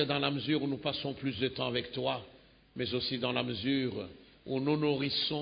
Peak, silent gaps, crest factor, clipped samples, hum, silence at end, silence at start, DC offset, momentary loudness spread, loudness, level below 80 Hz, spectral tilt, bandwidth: -14 dBFS; none; 20 dB; under 0.1%; none; 0 s; 0 s; under 0.1%; 9 LU; -33 LUFS; -62 dBFS; -9.5 dB/octave; 5.2 kHz